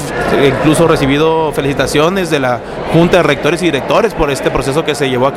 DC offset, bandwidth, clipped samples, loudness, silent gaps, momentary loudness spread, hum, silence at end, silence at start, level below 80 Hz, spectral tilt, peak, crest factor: under 0.1%; 16 kHz; under 0.1%; -12 LUFS; none; 5 LU; none; 0 s; 0 s; -32 dBFS; -5.5 dB/octave; 0 dBFS; 12 dB